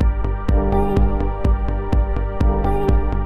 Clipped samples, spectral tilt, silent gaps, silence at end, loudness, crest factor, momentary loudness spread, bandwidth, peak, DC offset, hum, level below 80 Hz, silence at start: under 0.1%; -9.5 dB/octave; none; 0 s; -20 LUFS; 12 dB; 3 LU; 4.3 kHz; -4 dBFS; under 0.1%; none; -18 dBFS; 0 s